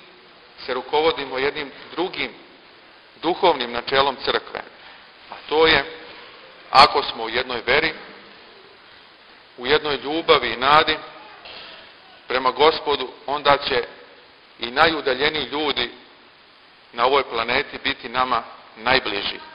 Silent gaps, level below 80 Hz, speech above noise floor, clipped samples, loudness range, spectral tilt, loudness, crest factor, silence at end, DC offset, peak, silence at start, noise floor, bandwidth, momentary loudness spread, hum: none; -52 dBFS; 30 dB; under 0.1%; 4 LU; -4.5 dB/octave; -20 LUFS; 22 dB; 0 s; under 0.1%; 0 dBFS; 0.6 s; -50 dBFS; 10.5 kHz; 21 LU; none